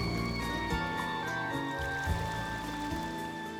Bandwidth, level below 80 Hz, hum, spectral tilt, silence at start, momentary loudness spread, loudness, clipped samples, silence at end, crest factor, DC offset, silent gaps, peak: over 20 kHz; -44 dBFS; none; -5 dB/octave; 0 s; 4 LU; -34 LUFS; under 0.1%; 0 s; 16 dB; under 0.1%; none; -18 dBFS